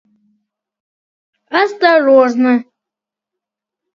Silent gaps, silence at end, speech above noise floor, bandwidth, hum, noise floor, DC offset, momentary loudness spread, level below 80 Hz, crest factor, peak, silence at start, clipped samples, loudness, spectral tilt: none; 1.35 s; 74 dB; 7.2 kHz; none; -85 dBFS; under 0.1%; 8 LU; -70 dBFS; 16 dB; 0 dBFS; 1.5 s; under 0.1%; -12 LUFS; -4.5 dB/octave